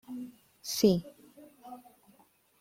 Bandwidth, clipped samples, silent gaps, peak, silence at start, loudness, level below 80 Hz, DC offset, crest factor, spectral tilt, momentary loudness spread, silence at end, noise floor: 16.5 kHz; under 0.1%; none; -12 dBFS; 0.1 s; -30 LUFS; -68 dBFS; under 0.1%; 22 dB; -5.5 dB/octave; 25 LU; 0.8 s; -65 dBFS